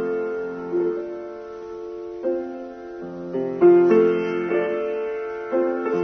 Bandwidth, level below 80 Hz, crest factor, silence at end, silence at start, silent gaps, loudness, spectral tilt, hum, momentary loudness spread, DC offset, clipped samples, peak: 6 kHz; -62 dBFS; 18 dB; 0 s; 0 s; none; -22 LUFS; -8.5 dB/octave; none; 19 LU; under 0.1%; under 0.1%; -4 dBFS